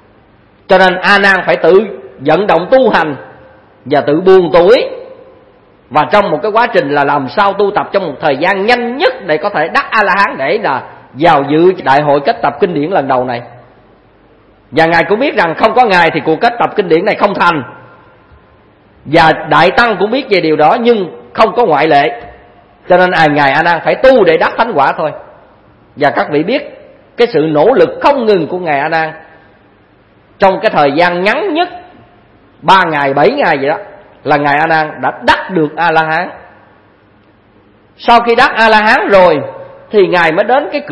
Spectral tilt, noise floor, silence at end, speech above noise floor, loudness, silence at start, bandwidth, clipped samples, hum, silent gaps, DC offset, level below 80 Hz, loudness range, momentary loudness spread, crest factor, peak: -6 dB/octave; -46 dBFS; 0 s; 36 dB; -10 LUFS; 0.7 s; 11 kHz; 0.7%; none; none; under 0.1%; -44 dBFS; 4 LU; 9 LU; 10 dB; 0 dBFS